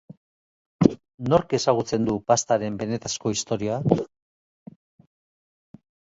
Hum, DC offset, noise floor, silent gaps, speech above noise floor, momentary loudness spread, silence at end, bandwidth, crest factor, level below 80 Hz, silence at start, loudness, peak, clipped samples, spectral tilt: none; under 0.1%; under -90 dBFS; 1.14-1.18 s; over 67 dB; 7 LU; 2.1 s; 8 kHz; 26 dB; -54 dBFS; 0.8 s; -24 LUFS; 0 dBFS; under 0.1%; -5.5 dB/octave